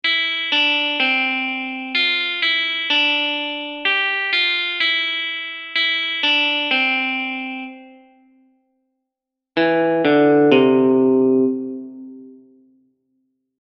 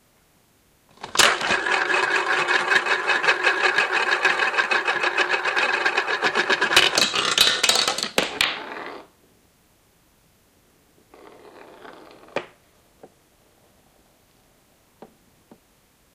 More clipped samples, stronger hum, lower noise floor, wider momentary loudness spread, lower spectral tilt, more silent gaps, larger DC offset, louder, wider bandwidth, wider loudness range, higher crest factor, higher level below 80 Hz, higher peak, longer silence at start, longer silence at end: neither; neither; first, -83 dBFS vs -60 dBFS; about the same, 11 LU vs 12 LU; first, -5 dB/octave vs -0.5 dB/octave; neither; neither; about the same, -17 LUFS vs -19 LUFS; second, 7 kHz vs 16.5 kHz; second, 4 LU vs 23 LU; about the same, 20 dB vs 22 dB; second, -72 dBFS vs -62 dBFS; about the same, 0 dBFS vs -2 dBFS; second, 0.05 s vs 1 s; second, 1.25 s vs 3.7 s